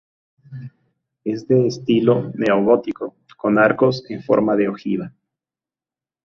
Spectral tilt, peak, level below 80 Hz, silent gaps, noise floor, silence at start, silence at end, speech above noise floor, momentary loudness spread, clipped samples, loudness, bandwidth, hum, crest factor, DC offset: -7.5 dB/octave; -2 dBFS; -60 dBFS; none; under -90 dBFS; 0.5 s; 1.3 s; over 72 dB; 18 LU; under 0.1%; -18 LUFS; 7.2 kHz; none; 18 dB; under 0.1%